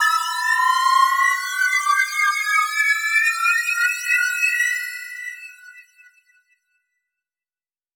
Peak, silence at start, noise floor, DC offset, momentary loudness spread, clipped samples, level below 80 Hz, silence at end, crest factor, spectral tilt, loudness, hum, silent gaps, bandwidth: -4 dBFS; 0 s; under -90 dBFS; under 0.1%; 13 LU; under 0.1%; under -90 dBFS; 2.15 s; 16 dB; 10 dB/octave; -18 LUFS; none; none; over 20 kHz